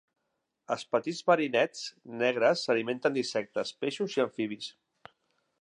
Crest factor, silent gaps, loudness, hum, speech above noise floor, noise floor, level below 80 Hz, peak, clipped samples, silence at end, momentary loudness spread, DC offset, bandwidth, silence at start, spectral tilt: 20 dB; none; -30 LUFS; none; 52 dB; -82 dBFS; -84 dBFS; -10 dBFS; under 0.1%; 0.9 s; 11 LU; under 0.1%; 10.5 kHz; 0.7 s; -4 dB/octave